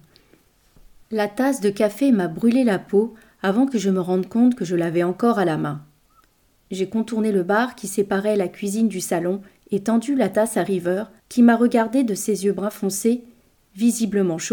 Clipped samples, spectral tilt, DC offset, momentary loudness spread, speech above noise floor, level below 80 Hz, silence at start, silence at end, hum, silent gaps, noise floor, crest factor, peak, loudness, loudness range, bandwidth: under 0.1%; -5.5 dB/octave; under 0.1%; 8 LU; 40 dB; -62 dBFS; 1.1 s; 0 s; none; none; -60 dBFS; 16 dB; -4 dBFS; -21 LUFS; 3 LU; 19.5 kHz